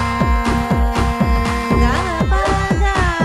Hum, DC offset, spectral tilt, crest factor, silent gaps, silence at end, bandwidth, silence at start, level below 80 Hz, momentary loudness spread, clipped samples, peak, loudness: none; under 0.1%; -6 dB/octave; 12 dB; none; 0 s; 13 kHz; 0 s; -20 dBFS; 2 LU; under 0.1%; -2 dBFS; -17 LUFS